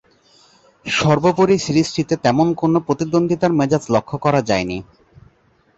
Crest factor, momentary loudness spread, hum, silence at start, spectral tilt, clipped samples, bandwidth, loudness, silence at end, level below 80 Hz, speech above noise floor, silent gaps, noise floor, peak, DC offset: 16 dB; 6 LU; none; 0.85 s; -6 dB/octave; under 0.1%; 8.2 kHz; -17 LUFS; 0.95 s; -50 dBFS; 40 dB; none; -57 dBFS; -2 dBFS; under 0.1%